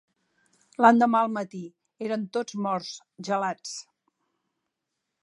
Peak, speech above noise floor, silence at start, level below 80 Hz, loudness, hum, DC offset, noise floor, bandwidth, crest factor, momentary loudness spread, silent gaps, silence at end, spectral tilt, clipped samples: -4 dBFS; 58 dB; 0.8 s; -80 dBFS; -25 LUFS; none; under 0.1%; -83 dBFS; 11 kHz; 24 dB; 20 LU; none; 1.4 s; -5 dB/octave; under 0.1%